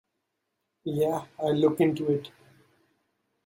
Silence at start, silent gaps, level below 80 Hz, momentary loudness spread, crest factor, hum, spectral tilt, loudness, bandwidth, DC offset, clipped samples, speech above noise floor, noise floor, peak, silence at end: 0.85 s; none; -70 dBFS; 12 LU; 20 dB; none; -7.5 dB/octave; -27 LUFS; 16.5 kHz; under 0.1%; under 0.1%; 55 dB; -81 dBFS; -10 dBFS; 1.15 s